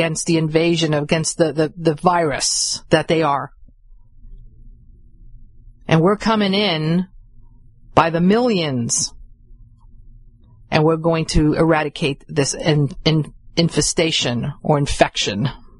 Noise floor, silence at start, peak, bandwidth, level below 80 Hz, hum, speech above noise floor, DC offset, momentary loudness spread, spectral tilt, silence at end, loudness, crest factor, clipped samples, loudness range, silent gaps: -46 dBFS; 0 s; 0 dBFS; 11.5 kHz; -36 dBFS; none; 28 dB; under 0.1%; 6 LU; -4.5 dB/octave; 0.25 s; -18 LUFS; 20 dB; under 0.1%; 4 LU; none